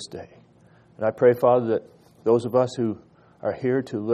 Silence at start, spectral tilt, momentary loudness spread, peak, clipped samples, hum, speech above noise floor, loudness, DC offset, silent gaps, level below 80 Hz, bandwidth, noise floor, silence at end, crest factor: 0 s; -7 dB/octave; 12 LU; -6 dBFS; under 0.1%; none; 33 dB; -23 LUFS; under 0.1%; none; -66 dBFS; 14 kHz; -55 dBFS; 0 s; 18 dB